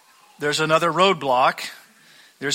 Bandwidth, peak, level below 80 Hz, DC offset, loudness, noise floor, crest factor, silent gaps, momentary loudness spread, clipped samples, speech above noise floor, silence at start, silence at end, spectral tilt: 16 kHz; -4 dBFS; -66 dBFS; under 0.1%; -20 LUFS; -52 dBFS; 18 dB; none; 13 LU; under 0.1%; 32 dB; 0.4 s; 0 s; -3.5 dB/octave